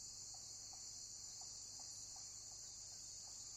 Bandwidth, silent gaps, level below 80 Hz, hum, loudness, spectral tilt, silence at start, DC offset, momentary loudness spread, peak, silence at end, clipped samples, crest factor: 16 kHz; none; -76 dBFS; none; -51 LUFS; 0.5 dB/octave; 0 s; under 0.1%; 1 LU; -40 dBFS; 0 s; under 0.1%; 14 dB